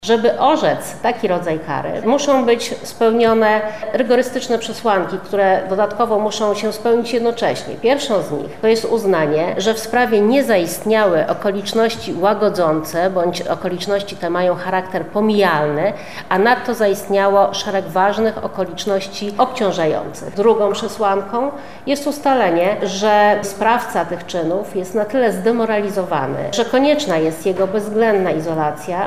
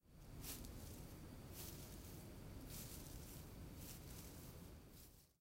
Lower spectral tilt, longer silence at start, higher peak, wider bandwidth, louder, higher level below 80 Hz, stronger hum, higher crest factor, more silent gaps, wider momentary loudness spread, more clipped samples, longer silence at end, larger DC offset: about the same, -4.5 dB/octave vs -4 dB/octave; about the same, 0 s vs 0.05 s; first, 0 dBFS vs -38 dBFS; about the same, 15.5 kHz vs 16 kHz; first, -17 LUFS vs -56 LUFS; first, -52 dBFS vs -62 dBFS; neither; about the same, 16 dB vs 18 dB; neither; about the same, 7 LU vs 8 LU; neither; about the same, 0 s vs 0.1 s; first, 1% vs under 0.1%